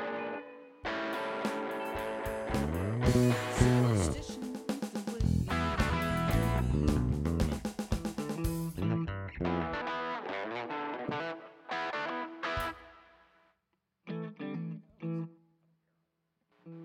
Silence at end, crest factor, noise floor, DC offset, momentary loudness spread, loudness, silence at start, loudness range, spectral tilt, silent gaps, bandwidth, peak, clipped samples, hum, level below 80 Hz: 0 s; 22 dB; -81 dBFS; under 0.1%; 12 LU; -34 LUFS; 0 s; 10 LU; -6 dB/octave; none; 17.5 kHz; -12 dBFS; under 0.1%; none; -44 dBFS